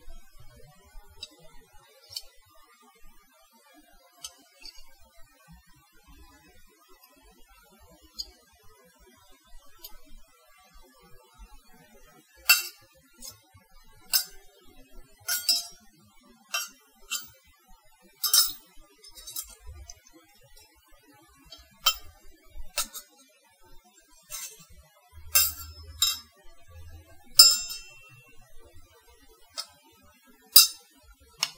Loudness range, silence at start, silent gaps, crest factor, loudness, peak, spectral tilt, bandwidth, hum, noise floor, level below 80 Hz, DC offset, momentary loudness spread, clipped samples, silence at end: 24 LU; 0.05 s; none; 32 dB; -23 LUFS; 0 dBFS; 2 dB/octave; 16 kHz; none; -60 dBFS; -54 dBFS; under 0.1%; 30 LU; under 0.1%; 0.05 s